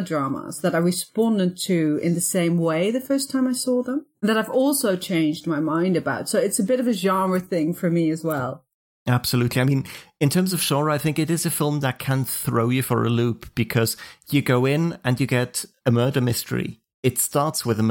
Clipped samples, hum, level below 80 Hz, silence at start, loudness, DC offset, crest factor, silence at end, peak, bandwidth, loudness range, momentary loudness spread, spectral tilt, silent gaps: under 0.1%; none; -58 dBFS; 0 s; -22 LUFS; under 0.1%; 16 dB; 0 s; -6 dBFS; 17 kHz; 1 LU; 5 LU; -5 dB/octave; 8.74-9.06 s, 16.94-17.03 s